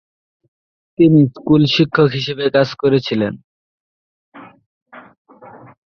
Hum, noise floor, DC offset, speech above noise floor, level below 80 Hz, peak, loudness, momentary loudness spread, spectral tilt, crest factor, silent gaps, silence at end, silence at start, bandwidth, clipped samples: none; -41 dBFS; under 0.1%; 27 dB; -54 dBFS; -2 dBFS; -15 LUFS; 10 LU; -7.5 dB/octave; 16 dB; 3.44-4.32 s, 4.66-4.86 s, 5.18-5.25 s; 0.4 s; 1 s; 6.6 kHz; under 0.1%